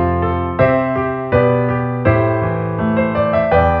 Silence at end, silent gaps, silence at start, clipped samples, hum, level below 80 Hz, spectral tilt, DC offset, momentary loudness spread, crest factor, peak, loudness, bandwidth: 0 s; none; 0 s; under 0.1%; none; -34 dBFS; -10.5 dB/octave; under 0.1%; 5 LU; 14 dB; 0 dBFS; -16 LUFS; 5 kHz